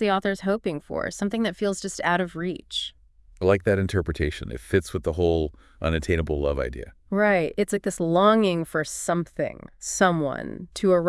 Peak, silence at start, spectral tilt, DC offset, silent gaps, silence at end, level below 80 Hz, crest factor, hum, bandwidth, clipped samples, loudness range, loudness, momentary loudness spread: -4 dBFS; 0 s; -5 dB/octave; under 0.1%; none; 0 s; -42 dBFS; 22 dB; none; 12 kHz; under 0.1%; 3 LU; -25 LUFS; 10 LU